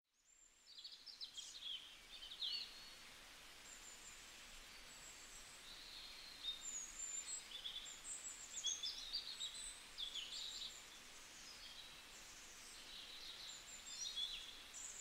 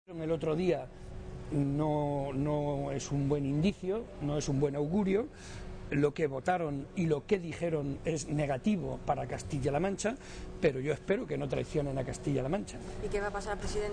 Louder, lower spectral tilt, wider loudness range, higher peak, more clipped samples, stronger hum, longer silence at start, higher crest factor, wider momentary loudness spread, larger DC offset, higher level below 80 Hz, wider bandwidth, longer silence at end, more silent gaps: second, -50 LUFS vs -33 LUFS; second, 1.5 dB/octave vs -6.5 dB/octave; first, 7 LU vs 2 LU; second, -32 dBFS vs -16 dBFS; neither; neither; first, 0.25 s vs 0.1 s; first, 22 dB vs 16 dB; first, 12 LU vs 6 LU; neither; second, -72 dBFS vs -48 dBFS; first, 16 kHz vs 10 kHz; about the same, 0 s vs 0 s; neither